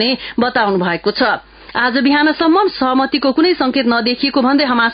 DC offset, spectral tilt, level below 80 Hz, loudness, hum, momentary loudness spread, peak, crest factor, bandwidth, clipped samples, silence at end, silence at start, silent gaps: under 0.1%; -10 dB/octave; -48 dBFS; -14 LUFS; none; 4 LU; -2 dBFS; 12 dB; 5.2 kHz; under 0.1%; 0 s; 0 s; none